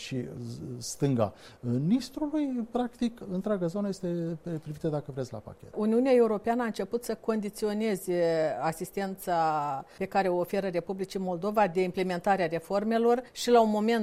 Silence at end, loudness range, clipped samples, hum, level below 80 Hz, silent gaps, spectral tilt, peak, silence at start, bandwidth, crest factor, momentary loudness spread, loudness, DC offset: 0 s; 4 LU; under 0.1%; none; -60 dBFS; none; -6 dB/octave; -10 dBFS; 0 s; 16 kHz; 18 dB; 11 LU; -29 LUFS; under 0.1%